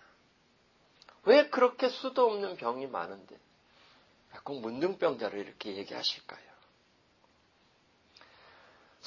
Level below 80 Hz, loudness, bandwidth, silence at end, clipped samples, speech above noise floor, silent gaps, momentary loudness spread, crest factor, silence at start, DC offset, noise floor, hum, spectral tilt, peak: -80 dBFS; -31 LUFS; 7.2 kHz; 2.65 s; under 0.1%; 35 dB; none; 19 LU; 24 dB; 1.25 s; under 0.1%; -68 dBFS; none; -4.5 dB/octave; -10 dBFS